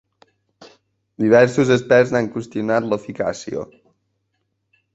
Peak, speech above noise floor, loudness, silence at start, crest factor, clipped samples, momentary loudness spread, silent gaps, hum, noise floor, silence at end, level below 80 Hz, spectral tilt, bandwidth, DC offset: -2 dBFS; 54 dB; -18 LUFS; 1.2 s; 18 dB; under 0.1%; 15 LU; none; none; -72 dBFS; 1.3 s; -56 dBFS; -6 dB/octave; 8 kHz; under 0.1%